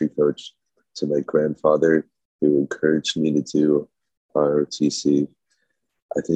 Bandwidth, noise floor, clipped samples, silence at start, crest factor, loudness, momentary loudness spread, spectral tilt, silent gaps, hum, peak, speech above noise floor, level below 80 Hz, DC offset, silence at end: 9 kHz; -73 dBFS; under 0.1%; 0 s; 18 dB; -21 LUFS; 11 LU; -5.5 dB/octave; 2.25-2.39 s, 4.17-4.29 s, 6.02-6.09 s; none; -4 dBFS; 53 dB; -64 dBFS; under 0.1%; 0 s